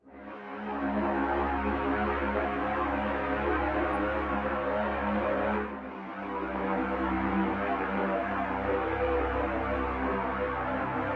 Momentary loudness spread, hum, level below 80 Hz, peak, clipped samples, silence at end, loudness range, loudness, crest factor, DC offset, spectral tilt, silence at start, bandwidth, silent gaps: 5 LU; none; -44 dBFS; -16 dBFS; under 0.1%; 0 s; 1 LU; -30 LUFS; 14 dB; under 0.1%; -8.5 dB/octave; 0.05 s; 6.4 kHz; none